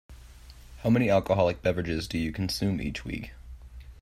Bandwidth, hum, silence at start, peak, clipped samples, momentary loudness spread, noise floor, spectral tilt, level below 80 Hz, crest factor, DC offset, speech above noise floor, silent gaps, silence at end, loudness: 15.5 kHz; none; 0.1 s; -10 dBFS; under 0.1%; 24 LU; -48 dBFS; -6.5 dB/octave; -46 dBFS; 20 dB; under 0.1%; 22 dB; none; 0 s; -28 LUFS